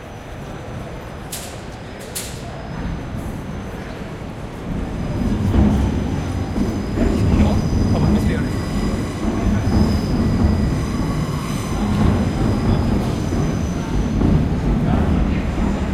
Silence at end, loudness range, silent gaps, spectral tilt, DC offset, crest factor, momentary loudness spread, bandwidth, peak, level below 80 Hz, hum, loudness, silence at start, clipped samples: 0 s; 10 LU; none; -7 dB/octave; under 0.1%; 16 dB; 13 LU; 15.5 kHz; -4 dBFS; -26 dBFS; none; -20 LUFS; 0 s; under 0.1%